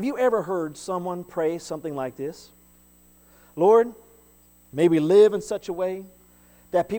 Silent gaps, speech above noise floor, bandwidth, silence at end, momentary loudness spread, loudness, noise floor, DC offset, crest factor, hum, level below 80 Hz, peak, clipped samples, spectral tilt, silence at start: none; 33 dB; 19 kHz; 0 s; 16 LU; -23 LUFS; -56 dBFS; under 0.1%; 18 dB; 60 Hz at -60 dBFS; -62 dBFS; -6 dBFS; under 0.1%; -6.5 dB/octave; 0 s